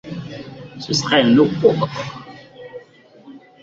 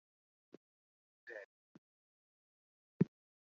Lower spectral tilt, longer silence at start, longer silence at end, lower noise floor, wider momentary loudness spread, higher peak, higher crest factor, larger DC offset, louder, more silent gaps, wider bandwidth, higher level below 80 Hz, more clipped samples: second, -5 dB/octave vs -9.5 dB/octave; second, 0.05 s vs 1.25 s; second, 0.25 s vs 0.4 s; second, -46 dBFS vs under -90 dBFS; first, 25 LU vs 22 LU; first, 0 dBFS vs -18 dBFS; second, 20 dB vs 30 dB; neither; first, -16 LUFS vs -42 LUFS; second, none vs 1.45-3.00 s; first, 7.8 kHz vs 6.2 kHz; first, -54 dBFS vs -86 dBFS; neither